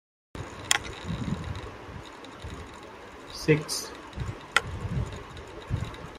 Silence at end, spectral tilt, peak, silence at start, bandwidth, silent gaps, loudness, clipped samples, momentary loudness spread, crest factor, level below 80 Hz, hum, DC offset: 0 s; -4 dB/octave; -2 dBFS; 0.35 s; 16 kHz; none; -31 LUFS; under 0.1%; 17 LU; 32 dB; -46 dBFS; none; under 0.1%